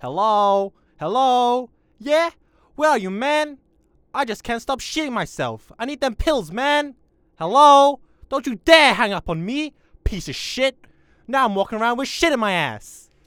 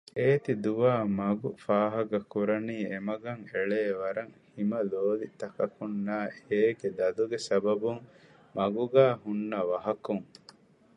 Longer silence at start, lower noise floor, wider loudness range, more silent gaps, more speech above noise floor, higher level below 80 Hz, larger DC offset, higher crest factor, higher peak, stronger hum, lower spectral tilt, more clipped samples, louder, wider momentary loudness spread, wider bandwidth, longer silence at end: second, 0 s vs 0.15 s; about the same, -60 dBFS vs -58 dBFS; first, 7 LU vs 4 LU; neither; first, 40 dB vs 28 dB; first, -40 dBFS vs -70 dBFS; neither; about the same, 20 dB vs 20 dB; first, 0 dBFS vs -8 dBFS; neither; second, -4 dB/octave vs -7 dB/octave; neither; first, -19 LUFS vs -30 LUFS; first, 16 LU vs 9 LU; first, 18.5 kHz vs 10 kHz; second, 0.3 s vs 0.75 s